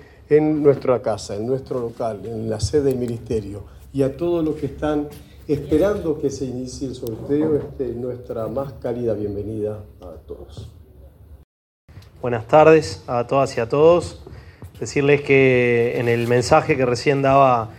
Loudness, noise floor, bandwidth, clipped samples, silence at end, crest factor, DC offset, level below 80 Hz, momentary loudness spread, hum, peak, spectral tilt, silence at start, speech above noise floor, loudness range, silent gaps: -20 LUFS; -45 dBFS; 16.5 kHz; under 0.1%; 0 s; 20 dB; under 0.1%; -46 dBFS; 17 LU; none; 0 dBFS; -6.5 dB/octave; 0.3 s; 25 dB; 11 LU; 11.44-11.88 s